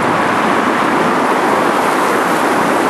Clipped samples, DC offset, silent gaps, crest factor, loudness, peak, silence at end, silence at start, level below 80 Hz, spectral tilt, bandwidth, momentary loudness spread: under 0.1%; under 0.1%; none; 12 dB; -13 LUFS; -2 dBFS; 0 s; 0 s; -54 dBFS; -4.5 dB/octave; 13 kHz; 0 LU